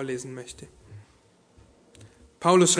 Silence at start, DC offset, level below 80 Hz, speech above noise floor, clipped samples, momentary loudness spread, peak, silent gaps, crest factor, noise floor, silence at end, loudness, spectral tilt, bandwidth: 0 s; under 0.1%; -62 dBFS; 37 dB; under 0.1%; 29 LU; -6 dBFS; none; 22 dB; -60 dBFS; 0 s; -25 LUFS; -4 dB/octave; 11 kHz